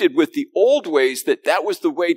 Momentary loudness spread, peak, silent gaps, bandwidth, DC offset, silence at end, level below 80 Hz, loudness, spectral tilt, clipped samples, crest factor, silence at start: 4 LU; -2 dBFS; none; 16 kHz; under 0.1%; 0 s; -90 dBFS; -18 LUFS; -3 dB/octave; under 0.1%; 16 dB; 0 s